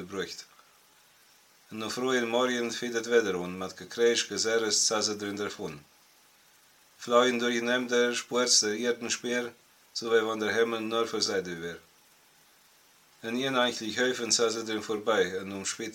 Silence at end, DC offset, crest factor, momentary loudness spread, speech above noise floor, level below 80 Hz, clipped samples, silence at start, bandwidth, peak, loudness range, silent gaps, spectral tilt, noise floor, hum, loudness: 0 s; under 0.1%; 22 dB; 14 LU; 32 dB; -76 dBFS; under 0.1%; 0 s; 17 kHz; -8 dBFS; 5 LU; none; -2 dB/octave; -61 dBFS; none; -28 LUFS